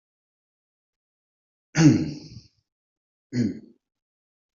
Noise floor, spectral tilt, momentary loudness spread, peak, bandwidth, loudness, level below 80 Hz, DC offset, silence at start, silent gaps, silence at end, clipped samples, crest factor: -46 dBFS; -7 dB/octave; 20 LU; -4 dBFS; 7.4 kHz; -23 LUFS; -60 dBFS; under 0.1%; 1.75 s; 2.72-3.30 s; 0.95 s; under 0.1%; 24 dB